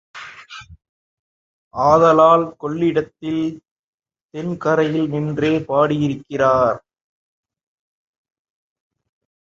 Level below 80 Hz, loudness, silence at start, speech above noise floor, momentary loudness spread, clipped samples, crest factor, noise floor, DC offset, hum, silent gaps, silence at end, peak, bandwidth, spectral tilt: -54 dBFS; -17 LUFS; 0.15 s; 22 dB; 23 LU; under 0.1%; 18 dB; -39 dBFS; under 0.1%; none; 0.89-1.71 s, 3.71-3.98 s, 4.23-4.29 s; 2.65 s; -2 dBFS; 7.4 kHz; -7 dB/octave